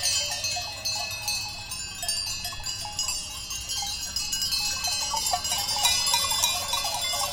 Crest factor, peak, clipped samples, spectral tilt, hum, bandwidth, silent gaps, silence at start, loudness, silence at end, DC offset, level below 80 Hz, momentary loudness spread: 22 dB; -6 dBFS; under 0.1%; 0.5 dB/octave; none; 17 kHz; none; 0 s; -26 LUFS; 0 s; under 0.1%; -48 dBFS; 9 LU